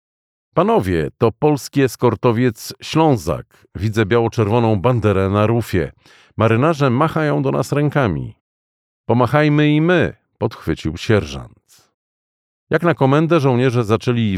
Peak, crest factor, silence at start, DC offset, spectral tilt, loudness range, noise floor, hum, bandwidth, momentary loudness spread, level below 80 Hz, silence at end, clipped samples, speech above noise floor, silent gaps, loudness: -2 dBFS; 16 dB; 0.55 s; under 0.1%; -7 dB/octave; 2 LU; under -90 dBFS; none; 15.5 kHz; 11 LU; -44 dBFS; 0 s; under 0.1%; over 74 dB; 8.40-9.04 s, 11.94-12.67 s; -17 LUFS